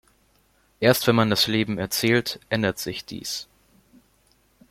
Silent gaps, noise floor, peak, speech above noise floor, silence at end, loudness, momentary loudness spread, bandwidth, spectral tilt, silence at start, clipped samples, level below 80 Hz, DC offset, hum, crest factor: none; -63 dBFS; -2 dBFS; 40 dB; 1.3 s; -23 LUFS; 12 LU; 16.5 kHz; -4.5 dB/octave; 0.8 s; under 0.1%; -58 dBFS; under 0.1%; none; 22 dB